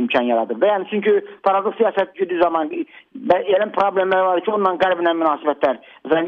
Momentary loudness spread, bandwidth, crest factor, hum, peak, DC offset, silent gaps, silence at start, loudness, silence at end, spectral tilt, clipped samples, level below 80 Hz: 5 LU; 6 kHz; 14 dB; none; -4 dBFS; under 0.1%; none; 0 s; -19 LUFS; 0 s; -7 dB/octave; under 0.1%; -62 dBFS